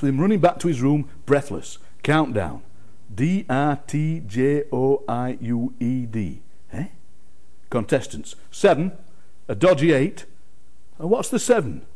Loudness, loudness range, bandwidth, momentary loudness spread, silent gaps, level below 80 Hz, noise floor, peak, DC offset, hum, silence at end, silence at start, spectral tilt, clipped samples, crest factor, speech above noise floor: -22 LUFS; 4 LU; 11 kHz; 15 LU; none; -52 dBFS; -58 dBFS; -6 dBFS; 3%; none; 0.15 s; 0 s; -6.5 dB/octave; under 0.1%; 18 dB; 37 dB